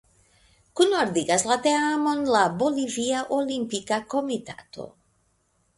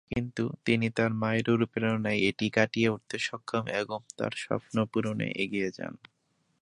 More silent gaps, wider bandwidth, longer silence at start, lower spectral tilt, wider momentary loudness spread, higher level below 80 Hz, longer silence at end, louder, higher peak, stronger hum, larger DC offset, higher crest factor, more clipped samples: neither; about the same, 11.5 kHz vs 11 kHz; first, 0.75 s vs 0.1 s; second, -3.5 dB/octave vs -6 dB/octave; first, 17 LU vs 7 LU; about the same, -64 dBFS vs -60 dBFS; first, 0.9 s vs 0.65 s; first, -24 LUFS vs -30 LUFS; about the same, -6 dBFS vs -8 dBFS; neither; neither; about the same, 20 dB vs 22 dB; neither